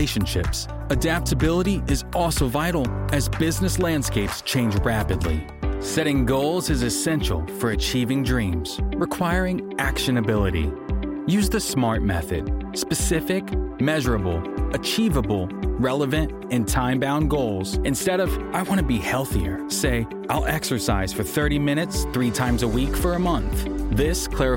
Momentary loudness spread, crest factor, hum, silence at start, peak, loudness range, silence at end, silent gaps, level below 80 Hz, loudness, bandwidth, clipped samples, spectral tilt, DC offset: 5 LU; 14 dB; none; 0 s; -8 dBFS; 1 LU; 0 s; none; -30 dBFS; -23 LUFS; 17 kHz; under 0.1%; -5 dB/octave; under 0.1%